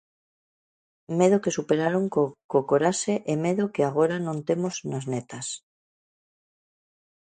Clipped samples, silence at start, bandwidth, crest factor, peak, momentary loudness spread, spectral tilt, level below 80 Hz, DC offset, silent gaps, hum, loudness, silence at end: under 0.1%; 1.1 s; 9.4 kHz; 20 dB; -6 dBFS; 10 LU; -5.5 dB/octave; -70 dBFS; under 0.1%; 2.44-2.49 s; none; -25 LUFS; 1.65 s